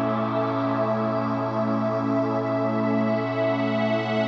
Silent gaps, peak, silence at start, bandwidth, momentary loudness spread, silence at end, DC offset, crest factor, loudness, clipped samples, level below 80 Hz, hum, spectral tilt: none; -12 dBFS; 0 s; 7 kHz; 1 LU; 0 s; under 0.1%; 12 dB; -24 LUFS; under 0.1%; -68 dBFS; none; -8.5 dB/octave